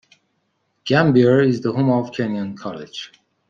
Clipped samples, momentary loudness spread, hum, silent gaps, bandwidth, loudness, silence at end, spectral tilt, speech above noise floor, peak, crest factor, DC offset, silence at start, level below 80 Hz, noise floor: under 0.1%; 19 LU; none; none; 7.4 kHz; -18 LUFS; 0.45 s; -7.5 dB/octave; 51 dB; -2 dBFS; 18 dB; under 0.1%; 0.85 s; -60 dBFS; -69 dBFS